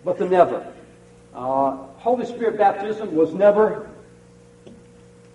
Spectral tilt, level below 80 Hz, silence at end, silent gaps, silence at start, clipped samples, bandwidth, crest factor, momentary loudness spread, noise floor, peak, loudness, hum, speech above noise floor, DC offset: -7.5 dB/octave; -60 dBFS; 0.65 s; none; 0.05 s; under 0.1%; 10.5 kHz; 20 dB; 16 LU; -48 dBFS; -2 dBFS; -20 LUFS; none; 29 dB; under 0.1%